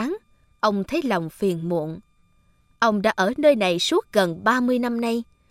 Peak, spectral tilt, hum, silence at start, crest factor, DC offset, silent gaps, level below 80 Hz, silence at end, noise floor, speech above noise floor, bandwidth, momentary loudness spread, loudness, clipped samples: -4 dBFS; -5 dB/octave; none; 0 s; 18 dB; under 0.1%; none; -58 dBFS; 0.25 s; -60 dBFS; 39 dB; 16 kHz; 10 LU; -22 LUFS; under 0.1%